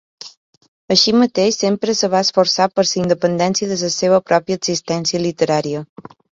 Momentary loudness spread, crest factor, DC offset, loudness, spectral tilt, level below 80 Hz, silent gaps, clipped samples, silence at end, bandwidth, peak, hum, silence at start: 9 LU; 16 dB; under 0.1%; -16 LUFS; -4 dB/octave; -58 dBFS; 0.37-0.61 s, 0.68-0.88 s; under 0.1%; 0.5 s; 7.8 kHz; 0 dBFS; none; 0.2 s